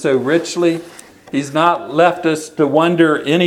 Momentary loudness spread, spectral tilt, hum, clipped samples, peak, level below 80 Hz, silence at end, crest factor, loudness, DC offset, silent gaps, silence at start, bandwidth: 7 LU; -5.5 dB/octave; none; under 0.1%; 0 dBFS; -62 dBFS; 0 s; 16 dB; -15 LUFS; under 0.1%; none; 0 s; 13.5 kHz